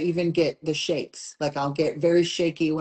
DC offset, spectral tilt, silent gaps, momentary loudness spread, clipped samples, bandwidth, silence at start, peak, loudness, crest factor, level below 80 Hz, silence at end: under 0.1%; -5.5 dB/octave; none; 8 LU; under 0.1%; 8.8 kHz; 0 s; -10 dBFS; -25 LUFS; 14 dB; -62 dBFS; 0 s